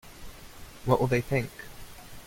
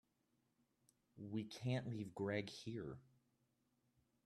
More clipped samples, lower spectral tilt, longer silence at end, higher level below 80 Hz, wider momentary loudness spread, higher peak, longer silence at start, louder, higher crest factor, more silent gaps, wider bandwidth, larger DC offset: neither; about the same, -6.5 dB/octave vs -6.5 dB/octave; second, 0 s vs 1.25 s; first, -48 dBFS vs -80 dBFS; first, 23 LU vs 10 LU; first, -8 dBFS vs -28 dBFS; second, 0.05 s vs 1.15 s; first, -28 LUFS vs -47 LUFS; about the same, 22 dB vs 22 dB; neither; first, 16.5 kHz vs 12.5 kHz; neither